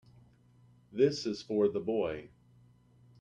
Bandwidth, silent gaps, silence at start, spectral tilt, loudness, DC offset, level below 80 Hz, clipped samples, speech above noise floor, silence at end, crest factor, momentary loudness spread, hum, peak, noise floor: 7.8 kHz; none; 0.9 s; -6 dB/octave; -32 LUFS; under 0.1%; -68 dBFS; under 0.1%; 31 dB; 0.95 s; 20 dB; 12 LU; none; -16 dBFS; -63 dBFS